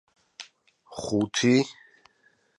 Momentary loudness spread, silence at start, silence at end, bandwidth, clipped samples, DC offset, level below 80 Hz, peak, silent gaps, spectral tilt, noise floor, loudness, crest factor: 23 LU; 0.4 s; 0.85 s; 11.5 kHz; under 0.1%; under 0.1%; -64 dBFS; -8 dBFS; none; -4.5 dB/octave; -66 dBFS; -25 LUFS; 20 dB